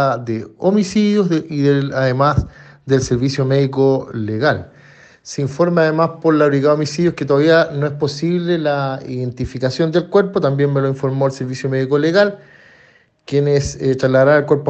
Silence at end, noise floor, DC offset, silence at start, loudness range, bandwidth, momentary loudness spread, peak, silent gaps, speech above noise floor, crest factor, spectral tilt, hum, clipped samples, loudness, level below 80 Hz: 0 s; -51 dBFS; under 0.1%; 0 s; 3 LU; 8.6 kHz; 9 LU; 0 dBFS; none; 36 dB; 16 dB; -6.5 dB/octave; none; under 0.1%; -16 LUFS; -42 dBFS